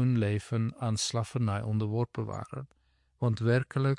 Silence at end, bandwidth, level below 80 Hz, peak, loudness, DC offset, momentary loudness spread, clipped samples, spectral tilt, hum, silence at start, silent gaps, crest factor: 0 s; 11.5 kHz; -64 dBFS; -16 dBFS; -31 LUFS; under 0.1%; 11 LU; under 0.1%; -6 dB/octave; none; 0 s; none; 14 dB